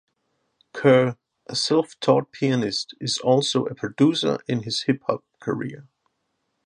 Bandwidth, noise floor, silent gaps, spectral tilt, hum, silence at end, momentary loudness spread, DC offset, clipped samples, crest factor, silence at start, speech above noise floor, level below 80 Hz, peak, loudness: 11 kHz; -75 dBFS; none; -5 dB/octave; none; 0.85 s; 11 LU; under 0.1%; under 0.1%; 20 dB; 0.75 s; 53 dB; -66 dBFS; -4 dBFS; -23 LUFS